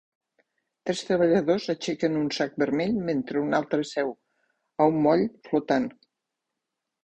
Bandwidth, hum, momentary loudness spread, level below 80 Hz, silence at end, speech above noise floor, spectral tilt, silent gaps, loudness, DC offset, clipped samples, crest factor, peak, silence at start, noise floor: 9.2 kHz; none; 9 LU; -64 dBFS; 1.1 s; 60 dB; -6 dB/octave; none; -26 LUFS; under 0.1%; under 0.1%; 20 dB; -6 dBFS; 0.85 s; -84 dBFS